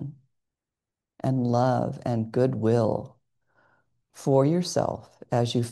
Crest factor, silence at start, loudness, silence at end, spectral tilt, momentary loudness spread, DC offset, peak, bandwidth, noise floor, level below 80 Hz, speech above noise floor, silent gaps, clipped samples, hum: 18 dB; 0 s; -25 LUFS; 0 s; -7 dB/octave; 11 LU; under 0.1%; -8 dBFS; 12.5 kHz; -89 dBFS; -62 dBFS; 64 dB; none; under 0.1%; none